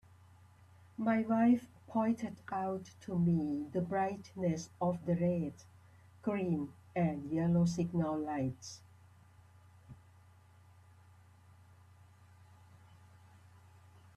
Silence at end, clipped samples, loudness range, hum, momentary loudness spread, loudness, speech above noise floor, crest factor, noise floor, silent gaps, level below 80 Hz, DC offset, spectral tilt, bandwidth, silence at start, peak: 4.2 s; under 0.1%; 7 LU; none; 10 LU; -35 LUFS; 28 dB; 18 dB; -62 dBFS; none; -68 dBFS; under 0.1%; -8 dB/octave; 10 kHz; 1 s; -20 dBFS